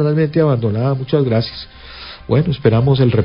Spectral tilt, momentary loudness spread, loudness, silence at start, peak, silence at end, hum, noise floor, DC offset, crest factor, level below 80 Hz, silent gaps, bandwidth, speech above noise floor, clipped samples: -12.5 dB/octave; 18 LU; -16 LUFS; 0 s; 0 dBFS; 0 s; none; -34 dBFS; under 0.1%; 16 dB; -40 dBFS; none; 5.4 kHz; 20 dB; under 0.1%